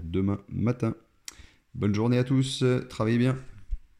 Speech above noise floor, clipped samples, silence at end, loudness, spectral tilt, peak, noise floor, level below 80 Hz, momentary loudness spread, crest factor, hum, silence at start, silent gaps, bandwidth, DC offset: 22 dB; under 0.1%; 0.15 s; -27 LUFS; -7 dB/octave; -12 dBFS; -48 dBFS; -46 dBFS; 19 LU; 14 dB; none; 0 s; none; 12.5 kHz; under 0.1%